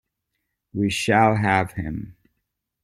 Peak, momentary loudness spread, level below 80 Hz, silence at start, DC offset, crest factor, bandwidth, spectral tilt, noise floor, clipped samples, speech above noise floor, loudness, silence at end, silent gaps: -4 dBFS; 17 LU; -50 dBFS; 0.75 s; under 0.1%; 20 dB; 15.5 kHz; -5.5 dB/octave; -78 dBFS; under 0.1%; 58 dB; -21 LUFS; 0.7 s; none